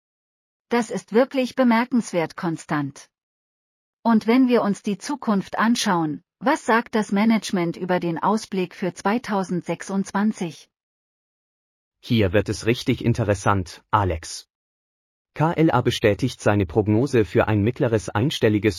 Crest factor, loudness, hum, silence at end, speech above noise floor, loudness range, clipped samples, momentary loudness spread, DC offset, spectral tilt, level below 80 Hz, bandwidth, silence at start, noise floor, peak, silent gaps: 18 dB; -22 LUFS; none; 0 s; over 69 dB; 5 LU; under 0.1%; 8 LU; under 0.1%; -6 dB/octave; -50 dBFS; 15 kHz; 0.7 s; under -90 dBFS; -4 dBFS; 3.23-4.03 s, 10.83-11.92 s, 14.55-15.25 s